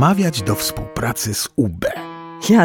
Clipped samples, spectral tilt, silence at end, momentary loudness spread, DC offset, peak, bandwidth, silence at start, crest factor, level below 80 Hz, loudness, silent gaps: under 0.1%; -5 dB/octave; 0 s; 10 LU; under 0.1%; -2 dBFS; 18.5 kHz; 0 s; 16 dB; -42 dBFS; -20 LUFS; none